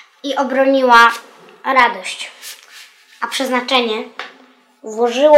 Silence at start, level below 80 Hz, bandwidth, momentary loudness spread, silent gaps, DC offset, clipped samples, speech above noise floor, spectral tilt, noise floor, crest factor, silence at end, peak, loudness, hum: 0.25 s; -62 dBFS; 16.5 kHz; 23 LU; none; under 0.1%; 0.3%; 35 dB; -2 dB/octave; -49 dBFS; 16 dB; 0 s; 0 dBFS; -14 LUFS; none